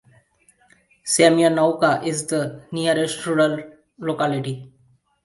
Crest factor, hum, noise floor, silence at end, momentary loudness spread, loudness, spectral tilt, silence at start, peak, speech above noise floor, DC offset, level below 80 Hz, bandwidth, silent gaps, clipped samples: 20 dB; none; -60 dBFS; 0.55 s; 15 LU; -20 LUFS; -4.5 dB/octave; 1.05 s; 0 dBFS; 40 dB; under 0.1%; -64 dBFS; 11.5 kHz; none; under 0.1%